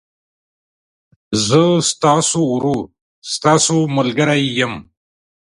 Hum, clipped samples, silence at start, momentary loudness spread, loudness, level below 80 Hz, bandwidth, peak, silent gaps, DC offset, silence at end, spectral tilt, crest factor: none; under 0.1%; 1.3 s; 11 LU; -15 LUFS; -52 dBFS; 11.5 kHz; 0 dBFS; 3.01-3.22 s; under 0.1%; 0.75 s; -4 dB/octave; 18 dB